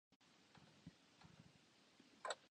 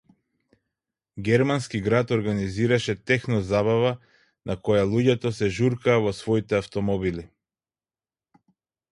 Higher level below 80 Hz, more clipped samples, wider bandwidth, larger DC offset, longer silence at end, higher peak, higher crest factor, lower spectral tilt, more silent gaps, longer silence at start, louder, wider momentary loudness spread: second, -86 dBFS vs -50 dBFS; neither; second, 9.6 kHz vs 11.5 kHz; neither; second, 0 s vs 1.65 s; second, -28 dBFS vs -6 dBFS; first, 32 dB vs 18 dB; second, -2.5 dB/octave vs -6.5 dB/octave; first, 0.16-0.20 s vs none; second, 0.1 s vs 1.15 s; second, -59 LUFS vs -24 LUFS; first, 18 LU vs 9 LU